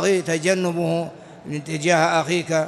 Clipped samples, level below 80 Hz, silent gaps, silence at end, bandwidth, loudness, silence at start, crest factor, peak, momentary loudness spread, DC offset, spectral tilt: under 0.1%; -64 dBFS; none; 0 s; 12 kHz; -21 LUFS; 0 s; 18 dB; -4 dBFS; 14 LU; under 0.1%; -4.5 dB/octave